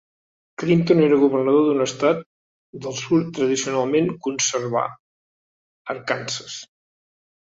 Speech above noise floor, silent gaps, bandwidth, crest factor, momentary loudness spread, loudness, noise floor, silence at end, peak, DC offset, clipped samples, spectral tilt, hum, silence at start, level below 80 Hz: over 70 dB; 2.26-2.73 s, 4.99-5.85 s; 8 kHz; 18 dB; 15 LU; -21 LUFS; under -90 dBFS; 0.95 s; -4 dBFS; under 0.1%; under 0.1%; -5 dB/octave; none; 0.6 s; -62 dBFS